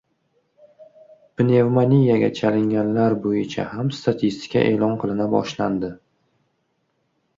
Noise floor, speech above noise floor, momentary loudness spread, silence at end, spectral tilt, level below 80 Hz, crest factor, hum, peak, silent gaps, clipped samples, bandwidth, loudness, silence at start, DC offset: -70 dBFS; 51 dB; 9 LU; 1.4 s; -8 dB/octave; -56 dBFS; 16 dB; none; -4 dBFS; none; under 0.1%; 7.6 kHz; -20 LUFS; 0.8 s; under 0.1%